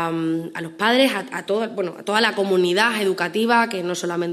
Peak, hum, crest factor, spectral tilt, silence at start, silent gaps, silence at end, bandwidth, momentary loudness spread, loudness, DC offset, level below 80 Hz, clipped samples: -2 dBFS; none; 20 dB; -4 dB/octave; 0 s; none; 0 s; 13.5 kHz; 9 LU; -20 LUFS; under 0.1%; -74 dBFS; under 0.1%